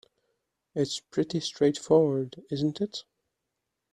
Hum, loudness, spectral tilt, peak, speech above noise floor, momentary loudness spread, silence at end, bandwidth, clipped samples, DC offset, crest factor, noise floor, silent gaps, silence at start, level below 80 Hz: none; -28 LUFS; -6 dB/octave; -10 dBFS; 56 dB; 12 LU; 0.9 s; 10.5 kHz; under 0.1%; under 0.1%; 20 dB; -83 dBFS; none; 0.75 s; -70 dBFS